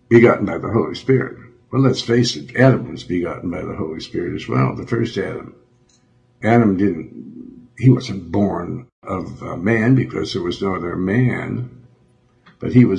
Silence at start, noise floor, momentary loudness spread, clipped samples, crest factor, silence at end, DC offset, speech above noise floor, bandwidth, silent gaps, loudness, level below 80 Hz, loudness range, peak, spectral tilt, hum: 0.1 s; -56 dBFS; 14 LU; under 0.1%; 18 dB; 0 s; under 0.1%; 38 dB; 8.8 kHz; 8.92-9.02 s; -19 LUFS; -50 dBFS; 3 LU; 0 dBFS; -7 dB/octave; none